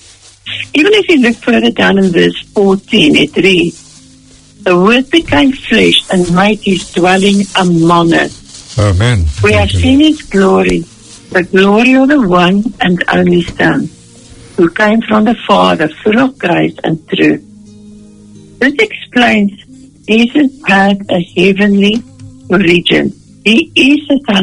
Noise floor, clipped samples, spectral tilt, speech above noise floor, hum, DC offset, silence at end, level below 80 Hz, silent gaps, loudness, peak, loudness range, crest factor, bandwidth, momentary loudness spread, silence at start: -40 dBFS; 0.5%; -5.5 dB/octave; 31 dB; none; under 0.1%; 0 s; -34 dBFS; none; -9 LUFS; 0 dBFS; 4 LU; 10 dB; 11 kHz; 7 LU; 0.45 s